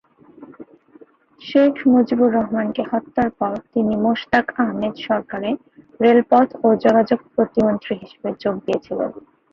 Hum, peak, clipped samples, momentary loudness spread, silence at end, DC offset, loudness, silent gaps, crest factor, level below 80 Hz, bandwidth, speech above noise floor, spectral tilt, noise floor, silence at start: none; -2 dBFS; under 0.1%; 11 LU; 0.35 s; under 0.1%; -19 LUFS; none; 18 dB; -56 dBFS; 6.6 kHz; 31 dB; -8 dB/octave; -49 dBFS; 0.4 s